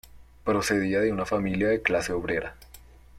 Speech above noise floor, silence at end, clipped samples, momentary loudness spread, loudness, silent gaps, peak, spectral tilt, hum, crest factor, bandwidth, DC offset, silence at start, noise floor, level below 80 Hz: 24 dB; 0 s; under 0.1%; 7 LU; -26 LUFS; none; -6 dBFS; -5 dB/octave; none; 22 dB; 16.5 kHz; under 0.1%; 0.05 s; -50 dBFS; -50 dBFS